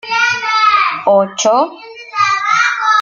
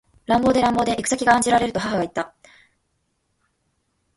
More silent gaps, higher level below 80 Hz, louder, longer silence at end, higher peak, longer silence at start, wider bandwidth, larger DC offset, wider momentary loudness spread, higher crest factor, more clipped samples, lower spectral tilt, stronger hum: neither; second, -60 dBFS vs -50 dBFS; first, -12 LUFS vs -20 LUFS; second, 0 s vs 1.9 s; about the same, -2 dBFS vs -2 dBFS; second, 0.05 s vs 0.3 s; second, 7.8 kHz vs 11.5 kHz; neither; second, 7 LU vs 10 LU; second, 12 dB vs 20 dB; neither; second, -2 dB/octave vs -4 dB/octave; neither